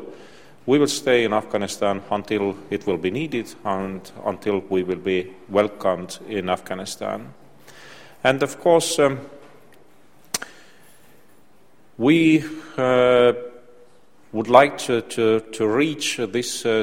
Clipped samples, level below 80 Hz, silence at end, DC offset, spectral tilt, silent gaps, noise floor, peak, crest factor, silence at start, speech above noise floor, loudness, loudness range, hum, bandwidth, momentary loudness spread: under 0.1%; -60 dBFS; 0 s; 0.4%; -4.5 dB/octave; none; -57 dBFS; 0 dBFS; 22 dB; 0 s; 36 dB; -21 LUFS; 6 LU; none; 16.5 kHz; 13 LU